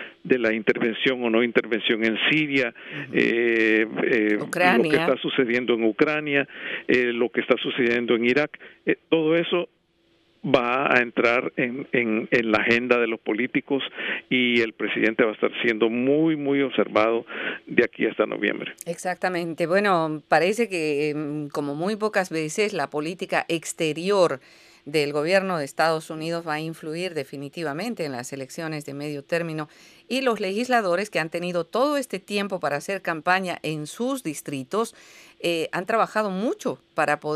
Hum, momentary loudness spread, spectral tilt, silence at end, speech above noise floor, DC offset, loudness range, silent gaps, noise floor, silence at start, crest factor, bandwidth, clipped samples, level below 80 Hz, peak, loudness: none; 10 LU; -5 dB/octave; 0 s; 40 dB; under 0.1%; 6 LU; none; -64 dBFS; 0 s; 22 dB; 15 kHz; under 0.1%; -68 dBFS; -2 dBFS; -23 LUFS